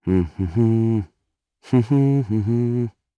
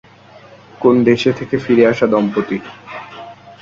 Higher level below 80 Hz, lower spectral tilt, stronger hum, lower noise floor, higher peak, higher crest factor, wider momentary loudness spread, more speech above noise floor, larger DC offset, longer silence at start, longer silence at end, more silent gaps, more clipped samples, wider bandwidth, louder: first, -46 dBFS vs -54 dBFS; first, -10.5 dB/octave vs -7 dB/octave; neither; first, -75 dBFS vs -42 dBFS; second, -6 dBFS vs 0 dBFS; about the same, 14 dB vs 16 dB; second, 7 LU vs 20 LU; first, 56 dB vs 28 dB; neither; second, 0.05 s vs 0.8 s; first, 0.3 s vs 0.1 s; neither; neither; about the same, 7 kHz vs 7.6 kHz; second, -20 LUFS vs -15 LUFS